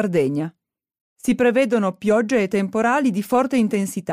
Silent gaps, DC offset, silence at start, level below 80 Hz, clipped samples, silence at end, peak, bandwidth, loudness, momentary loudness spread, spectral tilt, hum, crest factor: 1.01-1.16 s; under 0.1%; 0 s; -60 dBFS; under 0.1%; 0 s; -8 dBFS; 15.5 kHz; -20 LUFS; 6 LU; -6 dB/octave; none; 12 dB